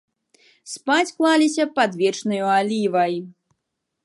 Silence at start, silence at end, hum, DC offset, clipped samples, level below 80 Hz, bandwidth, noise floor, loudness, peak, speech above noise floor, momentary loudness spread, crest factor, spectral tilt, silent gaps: 0.65 s; 0.75 s; none; under 0.1%; under 0.1%; -78 dBFS; 11.5 kHz; -79 dBFS; -20 LUFS; -6 dBFS; 59 dB; 8 LU; 16 dB; -4 dB/octave; none